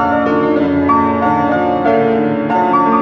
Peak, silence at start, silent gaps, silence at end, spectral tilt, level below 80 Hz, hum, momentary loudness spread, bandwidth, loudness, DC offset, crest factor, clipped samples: -2 dBFS; 0 s; none; 0 s; -8.5 dB/octave; -48 dBFS; none; 2 LU; 6 kHz; -13 LUFS; under 0.1%; 12 dB; under 0.1%